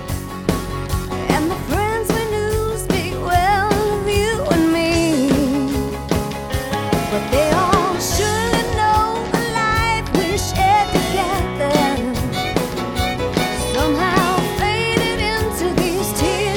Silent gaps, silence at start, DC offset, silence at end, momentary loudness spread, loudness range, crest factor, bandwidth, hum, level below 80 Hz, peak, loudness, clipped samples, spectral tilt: none; 0 s; under 0.1%; 0 s; 6 LU; 2 LU; 18 dB; over 20 kHz; none; -30 dBFS; 0 dBFS; -18 LUFS; under 0.1%; -4.5 dB/octave